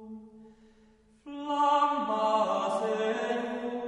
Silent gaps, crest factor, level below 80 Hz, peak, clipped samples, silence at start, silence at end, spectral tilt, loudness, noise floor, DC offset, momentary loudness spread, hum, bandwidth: none; 16 dB; -70 dBFS; -14 dBFS; under 0.1%; 0 s; 0 s; -4.5 dB/octave; -28 LUFS; -61 dBFS; under 0.1%; 17 LU; none; 10.5 kHz